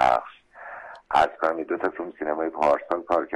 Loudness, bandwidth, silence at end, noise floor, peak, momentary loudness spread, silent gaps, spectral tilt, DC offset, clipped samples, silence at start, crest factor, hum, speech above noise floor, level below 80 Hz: -25 LUFS; 11.5 kHz; 0 s; -43 dBFS; -8 dBFS; 18 LU; none; -5 dB/octave; under 0.1%; under 0.1%; 0 s; 16 dB; none; 19 dB; -56 dBFS